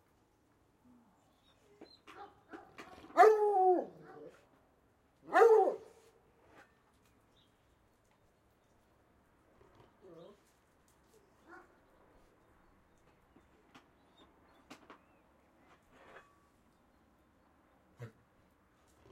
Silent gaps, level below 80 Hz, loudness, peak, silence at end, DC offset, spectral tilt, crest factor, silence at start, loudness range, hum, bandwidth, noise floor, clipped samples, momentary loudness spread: none; -78 dBFS; -28 LUFS; -12 dBFS; 1.05 s; under 0.1%; -5 dB/octave; 26 dB; 2.2 s; 4 LU; none; 13 kHz; -72 dBFS; under 0.1%; 31 LU